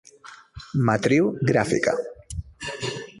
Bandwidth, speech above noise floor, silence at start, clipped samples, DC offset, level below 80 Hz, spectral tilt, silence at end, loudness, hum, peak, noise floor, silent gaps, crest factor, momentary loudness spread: 11.5 kHz; 26 dB; 0.25 s; under 0.1%; under 0.1%; -46 dBFS; -6 dB/octave; 0 s; -23 LUFS; none; -6 dBFS; -47 dBFS; none; 18 dB; 17 LU